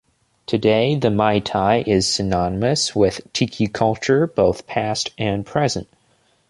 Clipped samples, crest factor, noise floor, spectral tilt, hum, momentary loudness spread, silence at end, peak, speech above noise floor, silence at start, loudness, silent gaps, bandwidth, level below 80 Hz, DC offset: under 0.1%; 18 dB; -61 dBFS; -5 dB/octave; none; 6 LU; 0.65 s; -2 dBFS; 42 dB; 0.5 s; -19 LUFS; none; 11.5 kHz; -44 dBFS; under 0.1%